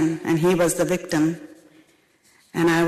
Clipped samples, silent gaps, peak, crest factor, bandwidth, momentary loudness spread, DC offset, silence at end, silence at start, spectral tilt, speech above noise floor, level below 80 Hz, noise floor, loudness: under 0.1%; none; -12 dBFS; 10 dB; 14 kHz; 9 LU; under 0.1%; 0 s; 0 s; -5.5 dB/octave; 39 dB; -56 dBFS; -59 dBFS; -22 LUFS